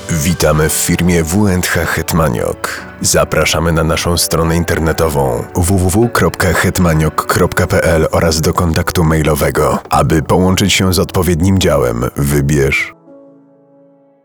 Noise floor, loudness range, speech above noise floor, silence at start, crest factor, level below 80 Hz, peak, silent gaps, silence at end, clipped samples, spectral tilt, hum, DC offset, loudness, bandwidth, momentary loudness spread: -47 dBFS; 1 LU; 34 dB; 0 s; 12 dB; -28 dBFS; 0 dBFS; none; 1.05 s; under 0.1%; -5 dB/octave; none; 0.8%; -12 LUFS; over 20 kHz; 4 LU